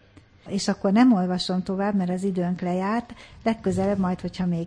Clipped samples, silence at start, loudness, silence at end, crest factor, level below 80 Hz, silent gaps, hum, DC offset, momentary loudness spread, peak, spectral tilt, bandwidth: under 0.1%; 0.45 s; -24 LUFS; 0 s; 18 dB; -52 dBFS; none; none; under 0.1%; 9 LU; -6 dBFS; -6.5 dB/octave; 10.5 kHz